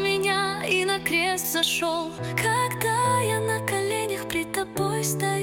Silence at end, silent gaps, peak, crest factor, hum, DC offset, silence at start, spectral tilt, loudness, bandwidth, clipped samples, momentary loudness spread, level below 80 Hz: 0 s; none; -8 dBFS; 16 dB; none; under 0.1%; 0 s; -3.5 dB/octave; -24 LUFS; 17 kHz; under 0.1%; 5 LU; -56 dBFS